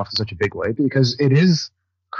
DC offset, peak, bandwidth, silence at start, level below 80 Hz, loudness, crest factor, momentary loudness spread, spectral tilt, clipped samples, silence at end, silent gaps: under 0.1%; -6 dBFS; 7.2 kHz; 0 s; -54 dBFS; -19 LUFS; 14 dB; 8 LU; -6 dB/octave; under 0.1%; 0 s; none